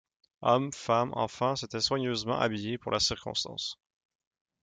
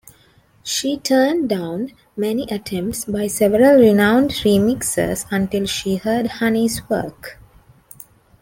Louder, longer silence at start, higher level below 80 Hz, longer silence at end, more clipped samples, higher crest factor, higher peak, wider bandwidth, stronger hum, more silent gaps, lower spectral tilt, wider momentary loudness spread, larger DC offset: second, -30 LUFS vs -18 LUFS; second, 0.4 s vs 0.65 s; second, -62 dBFS vs -48 dBFS; second, 0.9 s vs 1.1 s; neither; about the same, 20 dB vs 16 dB; second, -10 dBFS vs -2 dBFS; second, 9.6 kHz vs 17 kHz; neither; neither; about the same, -4 dB/octave vs -4.5 dB/octave; second, 7 LU vs 13 LU; neither